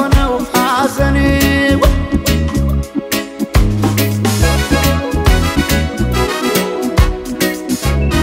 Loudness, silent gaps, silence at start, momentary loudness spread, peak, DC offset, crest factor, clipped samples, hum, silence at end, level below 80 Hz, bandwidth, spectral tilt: -14 LUFS; none; 0 s; 5 LU; 0 dBFS; under 0.1%; 12 dB; under 0.1%; none; 0 s; -18 dBFS; 16.5 kHz; -5 dB/octave